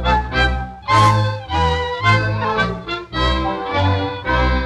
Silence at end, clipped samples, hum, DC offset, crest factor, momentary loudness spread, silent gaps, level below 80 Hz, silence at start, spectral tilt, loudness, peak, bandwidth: 0 s; under 0.1%; none; under 0.1%; 14 dB; 7 LU; none; -26 dBFS; 0 s; -5.5 dB/octave; -18 LUFS; -2 dBFS; 11.5 kHz